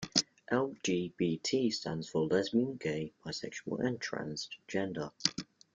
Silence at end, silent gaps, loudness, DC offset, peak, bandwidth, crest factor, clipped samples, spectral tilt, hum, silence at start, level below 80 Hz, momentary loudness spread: 0.35 s; none; -35 LUFS; under 0.1%; -8 dBFS; 9.4 kHz; 28 dB; under 0.1%; -4 dB/octave; none; 0 s; -70 dBFS; 9 LU